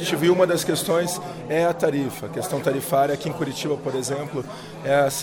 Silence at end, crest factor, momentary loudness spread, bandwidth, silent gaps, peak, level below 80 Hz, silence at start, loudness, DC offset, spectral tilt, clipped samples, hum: 0 s; 16 dB; 10 LU; 18 kHz; none; -8 dBFS; -60 dBFS; 0 s; -23 LUFS; under 0.1%; -4.5 dB/octave; under 0.1%; none